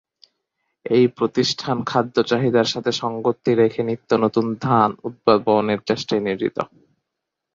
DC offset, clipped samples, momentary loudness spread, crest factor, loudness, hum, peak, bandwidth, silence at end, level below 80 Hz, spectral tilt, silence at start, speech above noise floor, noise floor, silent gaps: under 0.1%; under 0.1%; 6 LU; 20 dB; -20 LUFS; none; -2 dBFS; 7.8 kHz; 0.9 s; -60 dBFS; -5.5 dB/octave; 0.85 s; 62 dB; -81 dBFS; none